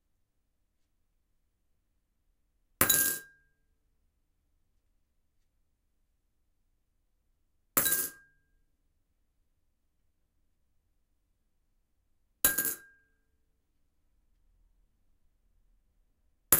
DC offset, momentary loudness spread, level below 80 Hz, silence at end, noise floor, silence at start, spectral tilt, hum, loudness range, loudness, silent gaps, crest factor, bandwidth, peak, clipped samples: under 0.1%; 13 LU; -64 dBFS; 0 s; -77 dBFS; 2.8 s; -1 dB/octave; none; 4 LU; -28 LUFS; none; 34 dB; 16 kHz; -4 dBFS; under 0.1%